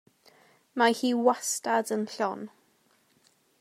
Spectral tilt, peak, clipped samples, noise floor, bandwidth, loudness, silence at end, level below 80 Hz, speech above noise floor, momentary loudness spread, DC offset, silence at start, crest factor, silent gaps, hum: -3 dB/octave; -10 dBFS; under 0.1%; -67 dBFS; 16 kHz; -27 LUFS; 1.1 s; under -90 dBFS; 40 dB; 15 LU; under 0.1%; 0.75 s; 20 dB; none; none